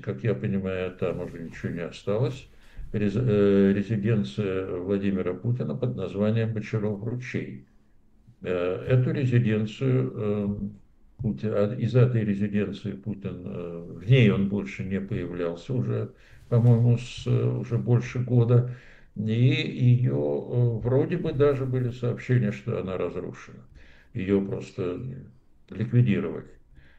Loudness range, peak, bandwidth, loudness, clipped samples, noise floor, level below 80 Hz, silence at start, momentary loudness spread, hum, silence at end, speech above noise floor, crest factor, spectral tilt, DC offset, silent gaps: 5 LU; -6 dBFS; 7.6 kHz; -26 LUFS; under 0.1%; -57 dBFS; -52 dBFS; 0 s; 13 LU; none; 0.5 s; 32 dB; 18 dB; -9 dB/octave; under 0.1%; none